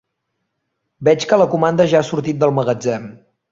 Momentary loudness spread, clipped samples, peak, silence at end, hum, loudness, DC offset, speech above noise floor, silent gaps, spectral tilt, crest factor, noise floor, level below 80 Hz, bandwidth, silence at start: 7 LU; under 0.1%; -2 dBFS; 0.35 s; none; -16 LUFS; under 0.1%; 58 dB; none; -6 dB/octave; 16 dB; -74 dBFS; -58 dBFS; 7.8 kHz; 1 s